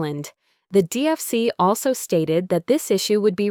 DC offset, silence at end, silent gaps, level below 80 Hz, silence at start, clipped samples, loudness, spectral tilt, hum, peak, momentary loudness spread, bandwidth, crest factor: under 0.1%; 0 s; none; -64 dBFS; 0 s; under 0.1%; -21 LUFS; -5 dB/octave; none; -6 dBFS; 3 LU; 19.5 kHz; 14 dB